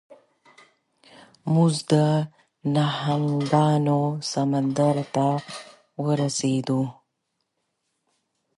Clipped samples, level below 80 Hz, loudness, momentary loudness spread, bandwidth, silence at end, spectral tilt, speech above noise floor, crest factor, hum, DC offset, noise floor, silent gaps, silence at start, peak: under 0.1%; -70 dBFS; -23 LUFS; 12 LU; 11.5 kHz; 1.65 s; -6.5 dB/octave; 55 dB; 18 dB; none; under 0.1%; -77 dBFS; none; 0.1 s; -6 dBFS